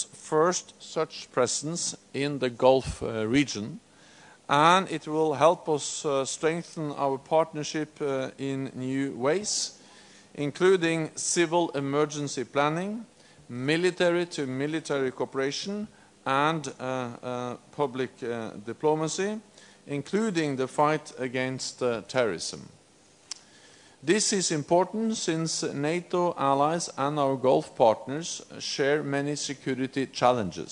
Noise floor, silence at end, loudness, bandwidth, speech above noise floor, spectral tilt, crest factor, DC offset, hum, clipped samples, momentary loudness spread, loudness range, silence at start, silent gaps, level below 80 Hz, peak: -58 dBFS; 0 s; -27 LUFS; 11 kHz; 31 dB; -4 dB/octave; 24 dB; under 0.1%; none; under 0.1%; 11 LU; 5 LU; 0 s; none; -60 dBFS; -4 dBFS